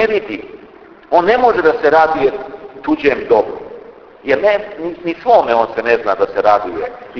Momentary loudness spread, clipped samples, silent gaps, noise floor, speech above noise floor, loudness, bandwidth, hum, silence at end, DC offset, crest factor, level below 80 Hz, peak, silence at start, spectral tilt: 16 LU; under 0.1%; none; -40 dBFS; 26 dB; -14 LUFS; 5.4 kHz; none; 0 s; under 0.1%; 14 dB; -48 dBFS; 0 dBFS; 0 s; -6 dB/octave